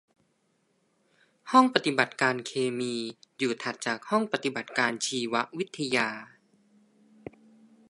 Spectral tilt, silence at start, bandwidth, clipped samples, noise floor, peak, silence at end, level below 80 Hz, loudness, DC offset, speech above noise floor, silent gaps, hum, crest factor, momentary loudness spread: -3.5 dB/octave; 1.45 s; 11.5 kHz; under 0.1%; -72 dBFS; -2 dBFS; 1.65 s; -76 dBFS; -28 LUFS; under 0.1%; 44 dB; none; none; 28 dB; 18 LU